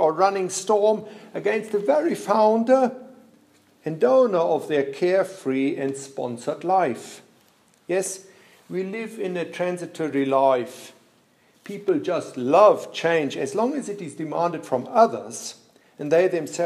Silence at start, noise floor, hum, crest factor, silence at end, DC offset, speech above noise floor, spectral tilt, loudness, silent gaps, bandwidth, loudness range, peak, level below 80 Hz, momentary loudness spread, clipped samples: 0 s; -60 dBFS; none; 20 dB; 0 s; under 0.1%; 38 dB; -5 dB/octave; -23 LUFS; none; 14 kHz; 6 LU; -2 dBFS; -80 dBFS; 15 LU; under 0.1%